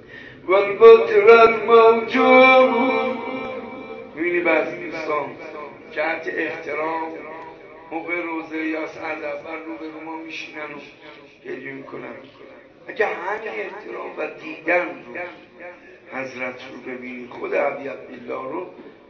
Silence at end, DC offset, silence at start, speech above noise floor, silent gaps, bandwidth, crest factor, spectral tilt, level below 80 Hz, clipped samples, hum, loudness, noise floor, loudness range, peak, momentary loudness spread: 0.2 s; under 0.1%; 0.1 s; 20 dB; none; 6.4 kHz; 20 dB; -5.5 dB/octave; -64 dBFS; under 0.1%; none; -18 LUFS; -40 dBFS; 17 LU; 0 dBFS; 23 LU